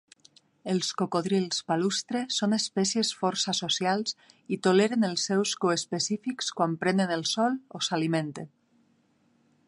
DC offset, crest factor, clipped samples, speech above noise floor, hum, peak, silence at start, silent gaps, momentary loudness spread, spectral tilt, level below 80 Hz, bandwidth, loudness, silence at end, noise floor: under 0.1%; 18 dB; under 0.1%; 40 dB; none; -10 dBFS; 0.65 s; none; 6 LU; -4 dB/octave; -76 dBFS; 11.5 kHz; -27 LUFS; 1.2 s; -67 dBFS